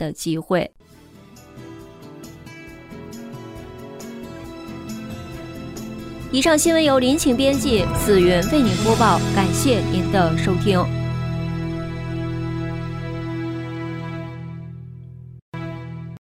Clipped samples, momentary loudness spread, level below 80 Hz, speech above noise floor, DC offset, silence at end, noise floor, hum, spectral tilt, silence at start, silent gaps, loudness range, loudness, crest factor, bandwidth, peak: under 0.1%; 23 LU; -40 dBFS; 29 dB; under 0.1%; 0.15 s; -46 dBFS; none; -5 dB/octave; 0 s; 15.42-15.52 s; 19 LU; -20 LUFS; 18 dB; 16 kHz; -4 dBFS